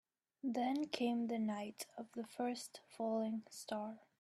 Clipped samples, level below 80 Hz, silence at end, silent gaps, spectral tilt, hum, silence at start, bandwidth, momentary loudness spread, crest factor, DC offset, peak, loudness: under 0.1%; -88 dBFS; 0.2 s; none; -4.5 dB/octave; none; 0.45 s; 14 kHz; 10 LU; 20 dB; under 0.1%; -22 dBFS; -42 LUFS